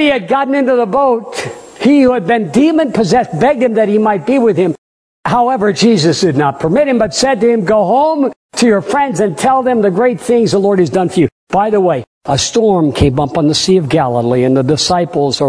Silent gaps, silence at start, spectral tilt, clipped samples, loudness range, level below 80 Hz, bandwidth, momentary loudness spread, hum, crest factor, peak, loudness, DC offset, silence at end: 4.78-5.23 s, 8.36-8.49 s, 11.32-11.47 s, 12.07-12.21 s; 0 s; -5.5 dB/octave; under 0.1%; 1 LU; -40 dBFS; 11 kHz; 5 LU; none; 12 dB; 0 dBFS; -12 LUFS; under 0.1%; 0 s